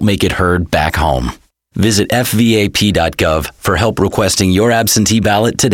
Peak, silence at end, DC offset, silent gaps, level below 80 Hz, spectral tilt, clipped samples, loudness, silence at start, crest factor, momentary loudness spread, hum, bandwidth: 0 dBFS; 0 s; 0.1%; none; -30 dBFS; -4.5 dB/octave; under 0.1%; -13 LUFS; 0 s; 12 dB; 5 LU; none; 17.5 kHz